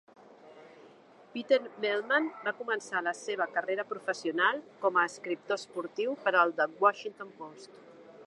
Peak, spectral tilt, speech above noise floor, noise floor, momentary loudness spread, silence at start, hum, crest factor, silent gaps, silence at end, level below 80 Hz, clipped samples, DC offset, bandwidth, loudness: -10 dBFS; -3 dB/octave; 25 dB; -56 dBFS; 15 LU; 0.45 s; none; 22 dB; none; 0 s; -90 dBFS; under 0.1%; under 0.1%; 11.5 kHz; -30 LUFS